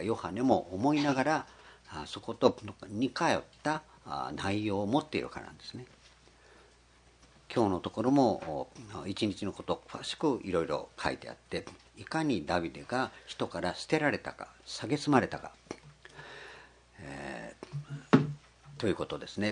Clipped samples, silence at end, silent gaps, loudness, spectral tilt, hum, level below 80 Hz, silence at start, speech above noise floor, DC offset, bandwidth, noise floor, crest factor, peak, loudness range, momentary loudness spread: under 0.1%; 0 s; none; -33 LUFS; -5.5 dB/octave; none; -64 dBFS; 0 s; 29 dB; under 0.1%; 10.5 kHz; -62 dBFS; 26 dB; -8 dBFS; 4 LU; 19 LU